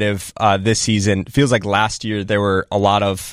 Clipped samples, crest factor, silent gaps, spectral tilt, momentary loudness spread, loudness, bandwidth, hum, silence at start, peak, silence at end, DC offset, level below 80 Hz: under 0.1%; 14 dB; none; -4.5 dB/octave; 4 LU; -17 LUFS; 15.5 kHz; none; 0 s; -2 dBFS; 0 s; under 0.1%; -44 dBFS